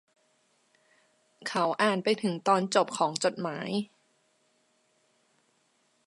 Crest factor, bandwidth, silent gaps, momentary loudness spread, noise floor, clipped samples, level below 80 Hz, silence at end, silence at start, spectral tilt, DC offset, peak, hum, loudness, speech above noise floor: 22 dB; 11.5 kHz; none; 9 LU; -71 dBFS; under 0.1%; -82 dBFS; 2.2 s; 1.4 s; -4 dB/octave; under 0.1%; -10 dBFS; none; -28 LUFS; 43 dB